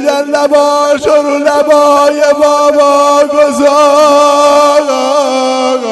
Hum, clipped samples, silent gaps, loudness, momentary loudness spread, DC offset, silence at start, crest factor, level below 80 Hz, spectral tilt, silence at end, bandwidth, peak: none; 0.4%; none; -7 LUFS; 5 LU; under 0.1%; 0 s; 8 dB; -50 dBFS; -2 dB/octave; 0 s; 12.5 kHz; 0 dBFS